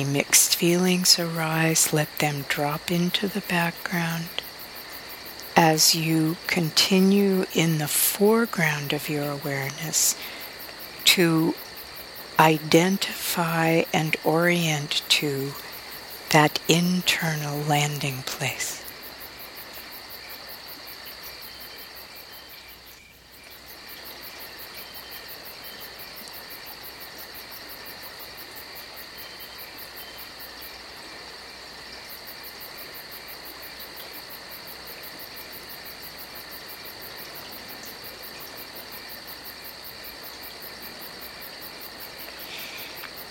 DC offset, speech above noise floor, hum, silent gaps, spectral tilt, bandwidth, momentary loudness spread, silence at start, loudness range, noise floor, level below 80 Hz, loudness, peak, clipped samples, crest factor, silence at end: under 0.1%; 26 dB; none; none; -3.5 dB/octave; 18 kHz; 18 LU; 0 s; 17 LU; -49 dBFS; -60 dBFS; -22 LUFS; -2 dBFS; under 0.1%; 24 dB; 0 s